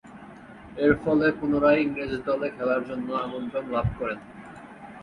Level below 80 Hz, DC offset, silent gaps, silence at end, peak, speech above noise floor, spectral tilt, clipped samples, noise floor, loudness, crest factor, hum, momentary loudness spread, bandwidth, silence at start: -48 dBFS; under 0.1%; none; 0 s; -6 dBFS; 20 dB; -8.5 dB/octave; under 0.1%; -45 dBFS; -25 LUFS; 20 dB; none; 22 LU; 9.6 kHz; 0.05 s